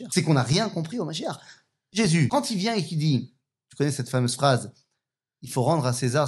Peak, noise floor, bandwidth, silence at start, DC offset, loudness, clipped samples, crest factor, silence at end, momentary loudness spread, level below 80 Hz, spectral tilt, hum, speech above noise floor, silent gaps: -6 dBFS; -83 dBFS; 12.5 kHz; 0 s; under 0.1%; -25 LUFS; under 0.1%; 20 dB; 0 s; 10 LU; -66 dBFS; -5.5 dB/octave; none; 59 dB; none